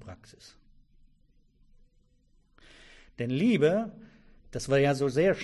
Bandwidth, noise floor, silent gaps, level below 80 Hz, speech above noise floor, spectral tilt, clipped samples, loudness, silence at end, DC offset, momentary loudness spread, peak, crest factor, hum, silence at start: 12 kHz; -65 dBFS; none; -60 dBFS; 38 dB; -6.5 dB/octave; under 0.1%; -27 LUFS; 0 s; under 0.1%; 18 LU; -12 dBFS; 18 dB; none; 0 s